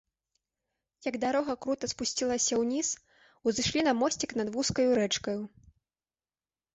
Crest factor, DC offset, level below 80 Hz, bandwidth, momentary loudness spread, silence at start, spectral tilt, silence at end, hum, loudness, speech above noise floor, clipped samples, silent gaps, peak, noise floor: 16 dB; under 0.1%; -60 dBFS; 8.4 kHz; 10 LU; 1.05 s; -3 dB/octave; 1.25 s; none; -30 LUFS; over 60 dB; under 0.1%; none; -16 dBFS; under -90 dBFS